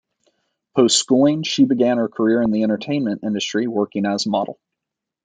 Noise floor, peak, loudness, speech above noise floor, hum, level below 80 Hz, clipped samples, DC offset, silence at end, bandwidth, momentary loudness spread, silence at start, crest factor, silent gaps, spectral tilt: -84 dBFS; -2 dBFS; -19 LUFS; 66 dB; none; -62 dBFS; under 0.1%; under 0.1%; 0.7 s; 9.6 kHz; 7 LU; 0.75 s; 16 dB; none; -4 dB/octave